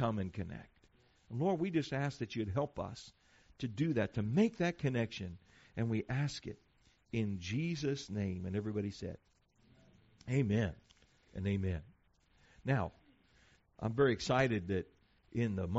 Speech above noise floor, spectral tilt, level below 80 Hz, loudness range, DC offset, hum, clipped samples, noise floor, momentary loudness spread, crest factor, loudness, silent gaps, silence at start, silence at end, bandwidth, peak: 35 dB; -6.5 dB/octave; -60 dBFS; 4 LU; under 0.1%; none; under 0.1%; -71 dBFS; 15 LU; 20 dB; -37 LUFS; none; 0 s; 0 s; 7.6 kHz; -18 dBFS